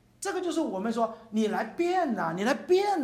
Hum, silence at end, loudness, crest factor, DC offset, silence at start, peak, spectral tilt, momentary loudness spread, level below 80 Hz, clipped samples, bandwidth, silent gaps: none; 0 s; -29 LUFS; 14 dB; under 0.1%; 0.2 s; -14 dBFS; -5 dB/octave; 5 LU; -70 dBFS; under 0.1%; 14.5 kHz; none